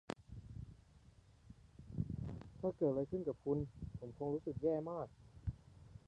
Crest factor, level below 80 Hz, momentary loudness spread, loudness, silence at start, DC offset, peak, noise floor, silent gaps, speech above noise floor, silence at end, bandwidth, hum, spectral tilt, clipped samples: 20 dB; -58 dBFS; 21 LU; -43 LUFS; 0.1 s; under 0.1%; -22 dBFS; -65 dBFS; none; 25 dB; 0.1 s; 10.5 kHz; none; -9.5 dB/octave; under 0.1%